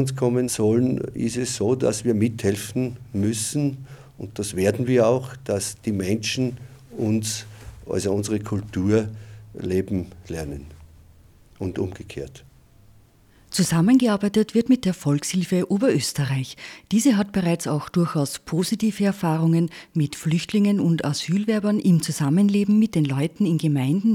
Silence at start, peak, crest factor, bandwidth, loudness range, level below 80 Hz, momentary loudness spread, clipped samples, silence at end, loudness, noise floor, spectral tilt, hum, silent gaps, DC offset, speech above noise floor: 0 s; -6 dBFS; 16 dB; 16.5 kHz; 7 LU; -52 dBFS; 13 LU; under 0.1%; 0 s; -22 LUFS; -54 dBFS; -6 dB/octave; none; none; under 0.1%; 32 dB